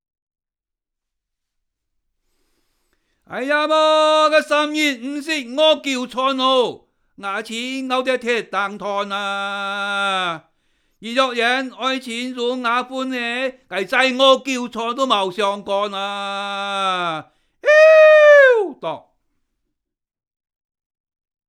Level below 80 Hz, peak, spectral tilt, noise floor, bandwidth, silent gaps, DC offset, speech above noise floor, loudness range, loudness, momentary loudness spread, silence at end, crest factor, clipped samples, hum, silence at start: -68 dBFS; 0 dBFS; -2.5 dB/octave; -87 dBFS; 12.5 kHz; none; under 0.1%; 67 dB; 8 LU; -17 LUFS; 14 LU; 2.5 s; 18 dB; under 0.1%; none; 3.3 s